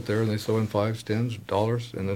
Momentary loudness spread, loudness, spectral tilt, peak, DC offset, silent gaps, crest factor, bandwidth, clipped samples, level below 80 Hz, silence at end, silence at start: 3 LU; -27 LUFS; -7 dB/octave; -12 dBFS; under 0.1%; none; 16 dB; 16 kHz; under 0.1%; -60 dBFS; 0 s; 0 s